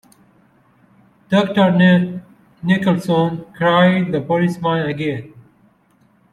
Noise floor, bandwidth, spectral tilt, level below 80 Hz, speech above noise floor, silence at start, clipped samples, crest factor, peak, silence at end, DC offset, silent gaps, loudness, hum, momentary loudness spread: -56 dBFS; 11.5 kHz; -7.5 dB/octave; -58 dBFS; 40 dB; 1.3 s; under 0.1%; 16 dB; -2 dBFS; 0.9 s; under 0.1%; none; -17 LUFS; none; 11 LU